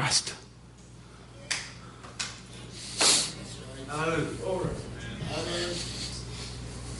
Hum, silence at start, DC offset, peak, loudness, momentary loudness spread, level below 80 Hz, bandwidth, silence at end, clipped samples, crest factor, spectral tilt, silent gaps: none; 0 s; under 0.1%; -8 dBFS; -30 LUFS; 23 LU; -48 dBFS; 11.5 kHz; 0 s; under 0.1%; 24 dB; -2.5 dB/octave; none